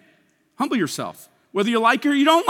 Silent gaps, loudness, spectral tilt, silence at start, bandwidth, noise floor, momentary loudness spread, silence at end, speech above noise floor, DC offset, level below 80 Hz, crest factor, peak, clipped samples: none; -21 LUFS; -4 dB/octave; 0.6 s; 17 kHz; -61 dBFS; 12 LU; 0 s; 41 dB; under 0.1%; -78 dBFS; 18 dB; -4 dBFS; under 0.1%